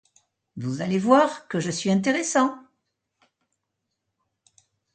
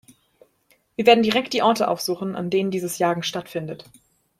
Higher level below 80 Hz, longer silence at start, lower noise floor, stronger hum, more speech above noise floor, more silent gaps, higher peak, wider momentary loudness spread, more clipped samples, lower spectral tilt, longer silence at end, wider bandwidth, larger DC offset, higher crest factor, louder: second, -70 dBFS vs -64 dBFS; second, 0.55 s vs 1 s; first, -80 dBFS vs -63 dBFS; neither; first, 58 dB vs 42 dB; neither; about the same, -4 dBFS vs -2 dBFS; about the same, 15 LU vs 15 LU; neither; about the same, -5 dB/octave vs -4.5 dB/octave; first, 2.35 s vs 0.6 s; second, 9.4 kHz vs 16 kHz; neither; about the same, 22 dB vs 20 dB; about the same, -23 LUFS vs -21 LUFS